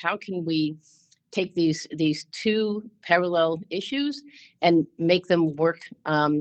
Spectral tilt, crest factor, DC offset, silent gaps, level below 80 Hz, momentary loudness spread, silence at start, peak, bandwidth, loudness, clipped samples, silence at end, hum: -6 dB/octave; 20 dB; under 0.1%; none; -68 dBFS; 9 LU; 0 s; -6 dBFS; 8.6 kHz; -25 LUFS; under 0.1%; 0 s; none